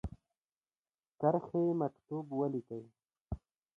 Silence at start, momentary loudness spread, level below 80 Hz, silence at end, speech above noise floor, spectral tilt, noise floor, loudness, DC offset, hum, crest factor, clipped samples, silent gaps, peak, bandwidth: 0.05 s; 15 LU; -56 dBFS; 0.4 s; over 55 dB; -11.5 dB/octave; under -90 dBFS; -35 LUFS; under 0.1%; none; 22 dB; under 0.1%; 0.38-0.49 s, 0.56-0.61 s, 0.77-0.82 s, 3.21-3.25 s; -16 dBFS; 3.8 kHz